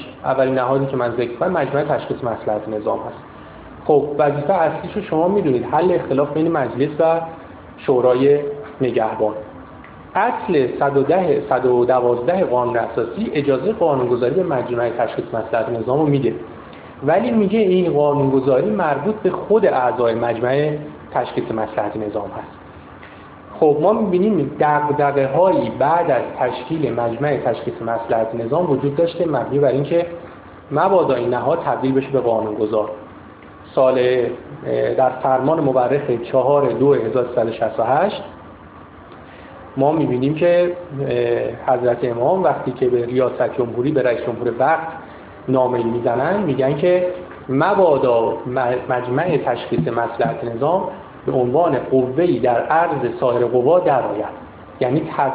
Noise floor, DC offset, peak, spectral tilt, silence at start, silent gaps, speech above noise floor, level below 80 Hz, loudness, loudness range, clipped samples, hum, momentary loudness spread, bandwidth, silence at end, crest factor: -40 dBFS; under 0.1%; -2 dBFS; -11 dB/octave; 0 s; none; 22 dB; -52 dBFS; -18 LUFS; 3 LU; under 0.1%; none; 11 LU; 4 kHz; 0 s; 16 dB